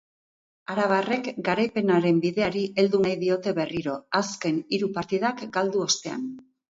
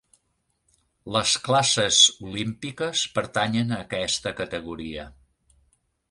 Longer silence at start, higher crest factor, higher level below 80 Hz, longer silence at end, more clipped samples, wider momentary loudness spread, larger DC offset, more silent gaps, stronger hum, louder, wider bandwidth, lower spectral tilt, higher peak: second, 0.7 s vs 1.05 s; second, 18 dB vs 24 dB; second, -64 dBFS vs -54 dBFS; second, 0.35 s vs 1 s; neither; second, 7 LU vs 16 LU; neither; neither; neither; second, -25 LUFS vs -22 LUFS; second, 8 kHz vs 11.5 kHz; first, -4.5 dB/octave vs -2.5 dB/octave; second, -8 dBFS vs -2 dBFS